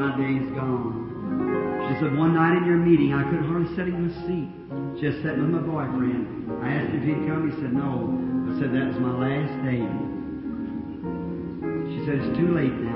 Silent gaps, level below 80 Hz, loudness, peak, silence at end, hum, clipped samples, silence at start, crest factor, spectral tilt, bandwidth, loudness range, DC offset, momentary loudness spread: none; -50 dBFS; -25 LUFS; -8 dBFS; 0 s; none; under 0.1%; 0 s; 16 dB; -12.5 dB/octave; 5.6 kHz; 5 LU; under 0.1%; 11 LU